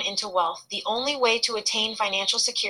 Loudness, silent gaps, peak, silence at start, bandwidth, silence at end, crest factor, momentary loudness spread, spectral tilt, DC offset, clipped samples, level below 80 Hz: -24 LUFS; none; -8 dBFS; 0 s; 16 kHz; 0 s; 16 dB; 6 LU; 0 dB/octave; under 0.1%; under 0.1%; -70 dBFS